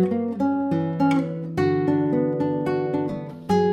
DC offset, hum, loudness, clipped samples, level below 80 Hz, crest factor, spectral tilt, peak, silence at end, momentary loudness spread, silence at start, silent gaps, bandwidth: under 0.1%; none; -23 LUFS; under 0.1%; -58 dBFS; 14 dB; -8.5 dB/octave; -8 dBFS; 0 s; 5 LU; 0 s; none; 9.6 kHz